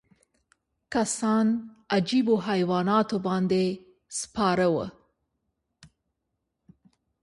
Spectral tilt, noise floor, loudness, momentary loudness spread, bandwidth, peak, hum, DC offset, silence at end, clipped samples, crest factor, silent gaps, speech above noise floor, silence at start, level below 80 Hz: -5 dB/octave; -81 dBFS; -26 LUFS; 9 LU; 11.5 kHz; -8 dBFS; none; under 0.1%; 1.35 s; under 0.1%; 20 dB; none; 56 dB; 0.9 s; -62 dBFS